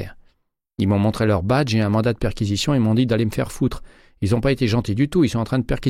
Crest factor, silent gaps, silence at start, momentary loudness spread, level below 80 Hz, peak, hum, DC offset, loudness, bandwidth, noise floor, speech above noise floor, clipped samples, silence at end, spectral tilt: 14 dB; none; 0 s; 6 LU; -38 dBFS; -6 dBFS; none; under 0.1%; -20 LUFS; 15 kHz; -67 dBFS; 48 dB; under 0.1%; 0 s; -6.5 dB/octave